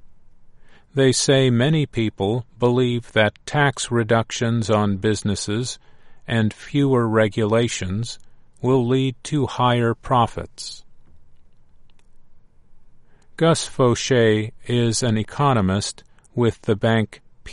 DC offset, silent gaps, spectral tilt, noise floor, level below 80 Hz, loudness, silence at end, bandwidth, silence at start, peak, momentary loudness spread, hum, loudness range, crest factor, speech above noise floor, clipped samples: under 0.1%; none; -5.5 dB/octave; -45 dBFS; -48 dBFS; -20 LUFS; 0 s; 11.5 kHz; 0.05 s; -2 dBFS; 11 LU; none; 5 LU; 20 dB; 26 dB; under 0.1%